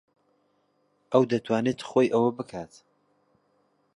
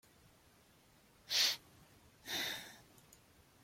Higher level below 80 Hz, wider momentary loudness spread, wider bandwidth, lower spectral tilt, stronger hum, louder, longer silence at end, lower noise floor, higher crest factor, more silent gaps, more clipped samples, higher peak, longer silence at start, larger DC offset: first, -70 dBFS vs -76 dBFS; second, 15 LU vs 23 LU; second, 11 kHz vs 16.5 kHz; first, -6.5 dB/octave vs 0.5 dB/octave; neither; first, -25 LUFS vs -36 LUFS; first, 1.3 s vs 0.85 s; about the same, -70 dBFS vs -67 dBFS; about the same, 22 dB vs 24 dB; neither; neither; first, -6 dBFS vs -20 dBFS; second, 1.1 s vs 1.3 s; neither